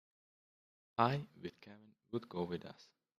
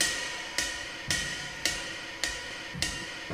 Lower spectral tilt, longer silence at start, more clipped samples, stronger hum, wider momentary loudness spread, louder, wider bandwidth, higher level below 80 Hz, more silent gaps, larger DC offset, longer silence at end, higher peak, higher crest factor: first, -7.5 dB/octave vs -1 dB/octave; first, 1 s vs 0 s; neither; neither; first, 24 LU vs 6 LU; second, -40 LUFS vs -32 LUFS; second, 13.5 kHz vs 16 kHz; second, -78 dBFS vs -52 dBFS; neither; neither; first, 0.35 s vs 0 s; second, -16 dBFS vs -10 dBFS; about the same, 28 dB vs 24 dB